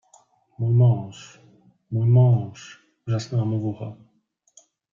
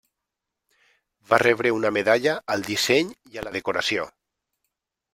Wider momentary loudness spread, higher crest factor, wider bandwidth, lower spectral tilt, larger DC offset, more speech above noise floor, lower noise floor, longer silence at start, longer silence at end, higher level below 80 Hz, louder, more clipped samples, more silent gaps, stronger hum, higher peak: first, 22 LU vs 12 LU; second, 14 dB vs 24 dB; second, 7.4 kHz vs 16 kHz; first, -8.5 dB/octave vs -3.5 dB/octave; neither; second, 46 dB vs 61 dB; second, -67 dBFS vs -84 dBFS; second, 0.6 s vs 1.3 s; about the same, 1 s vs 1.05 s; about the same, -62 dBFS vs -62 dBFS; about the same, -22 LUFS vs -22 LUFS; neither; neither; neither; second, -8 dBFS vs -2 dBFS